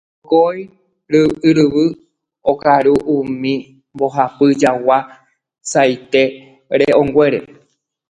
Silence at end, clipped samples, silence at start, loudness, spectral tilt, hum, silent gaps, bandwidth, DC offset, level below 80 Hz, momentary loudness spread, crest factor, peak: 0.65 s; under 0.1%; 0.3 s; -15 LUFS; -5.5 dB/octave; none; none; 10.5 kHz; under 0.1%; -52 dBFS; 9 LU; 16 dB; 0 dBFS